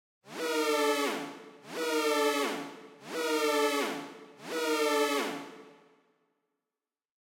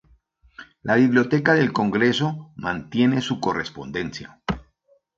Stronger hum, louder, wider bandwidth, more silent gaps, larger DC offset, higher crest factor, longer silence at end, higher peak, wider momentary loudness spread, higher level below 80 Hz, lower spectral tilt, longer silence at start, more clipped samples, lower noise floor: neither; second, -30 LUFS vs -22 LUFS; first, 16.5 kHz vs 7.6 kHz; neither; neither; about the same, 16 dB vs 20 dB; first, 1.65 s vs 0.6 s; second, -16 dBFS vs -4 dBFS; first, 18 LU vs 13 LU; second, under -90 dBFS vs -50 dBFS; second, -2 dB/octave vs -6 dB/octave; second, 0.25 s vs 0.6 s; neither; first, under -90 dBFS vs -63 dBFS